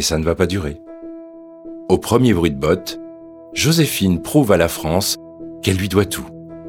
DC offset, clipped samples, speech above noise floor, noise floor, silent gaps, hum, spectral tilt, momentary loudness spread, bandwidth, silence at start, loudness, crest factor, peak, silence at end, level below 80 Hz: under 0.1%; under 0.1%; 20 dB; -37 dBFS; none; none; -5 dB/octave; 20 LU; 19 kHz; 0 s; -17 LUFS; 18 dB; 0 dBFS; 0 s; -38 dBFS